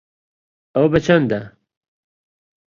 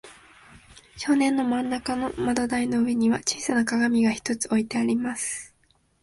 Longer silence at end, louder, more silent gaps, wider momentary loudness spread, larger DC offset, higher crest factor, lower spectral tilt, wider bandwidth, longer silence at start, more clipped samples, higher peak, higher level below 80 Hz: first, 1.25 s vs 0.55 s; first, -17 LUFS vs -25 LUFS; neither; first, 10 LU vs 6 LU; neither; about the same, 20 dB vs 18 dB; first, -7 dB/octave vs -3.5 dB/octave; second, 7.4 kHz vs 11.5 kHz; first, 0.75 s vs 0.05 s; neither; first, -2 dBFS vs -8 dBFS; first, -48 dBFS vs -56 dBFS